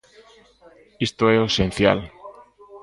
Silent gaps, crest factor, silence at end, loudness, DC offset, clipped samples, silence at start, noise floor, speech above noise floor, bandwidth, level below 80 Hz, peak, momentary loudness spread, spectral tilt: none; 22 dB; 0.05 s; -20 LUFS; under 0.1%; under 0.1%; 1 s; -52 dBFS; 32 dB; 11.5 kHz; -44 dBFS; 0 dBFS; 9 LU; -5.5 dB/octave